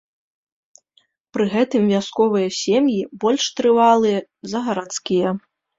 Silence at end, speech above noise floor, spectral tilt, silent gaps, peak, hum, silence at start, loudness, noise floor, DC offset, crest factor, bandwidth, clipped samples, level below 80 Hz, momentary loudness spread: 0.4 s; 44 dB; -5 dB/octave; none; -4 dBFS; none; 1.35 s; -19 LUFS; -62 dBFS; under 0.1%; 16 dB; 7.8 kHz; under 0.1%; -62 dBFS; 11 LU